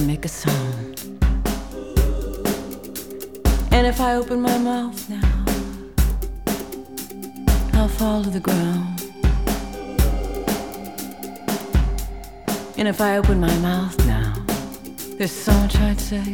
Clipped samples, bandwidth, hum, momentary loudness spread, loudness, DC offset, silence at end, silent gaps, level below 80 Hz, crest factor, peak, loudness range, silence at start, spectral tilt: under 0.1%; 19.5 kHz; none; 13 LU; -22 LUFS; 0.4%; 0 s; none; -24 dBFS; 18 dB; -2 dBFS; 4 LU; 0 s; -5.5 dB/octave